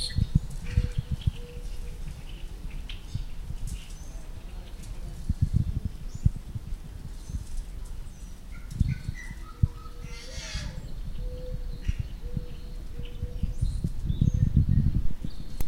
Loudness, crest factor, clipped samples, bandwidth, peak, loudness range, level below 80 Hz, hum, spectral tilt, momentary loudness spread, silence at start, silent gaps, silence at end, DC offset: -33 LUFS; 22 dB; under 0.1%; 16 kHz; -8 dBFS; 9 LU; -32 dBFS; none; -6.5 dB/octave; 16 LU; 0 s; none; 0 s; under 0.1%